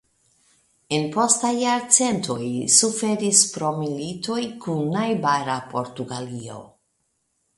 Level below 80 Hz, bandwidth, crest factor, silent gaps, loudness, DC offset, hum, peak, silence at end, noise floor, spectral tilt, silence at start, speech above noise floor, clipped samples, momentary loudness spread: -64 dBFS; 12 kHz; 24 dB; none; -21 LUFS; under 0.1%; none; 0 dBFS; 0.9 s; -72 dBFS; -3 dB/octave; 0.9 s; 49 dB; under 0.1%; 15 LU